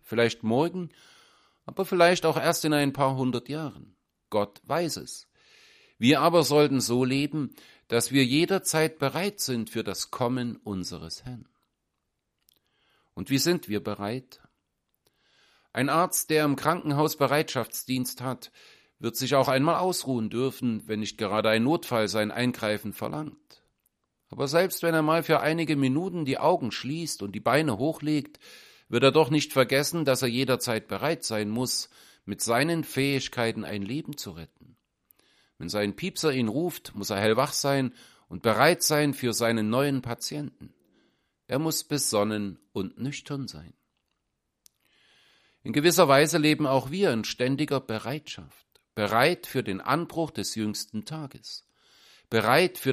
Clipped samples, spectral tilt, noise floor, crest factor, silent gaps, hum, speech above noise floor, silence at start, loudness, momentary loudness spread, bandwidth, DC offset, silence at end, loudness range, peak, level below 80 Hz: under 0.1%; -4.5 dB/octave; -80 dBFS; 22 dB; none; none; 54 dB; 0.05 s; -26 LUFS; 15 LU; 15.5 kHz; under 0.1%; 0 s; 7 LU; -4 dBFS; -64 dBFS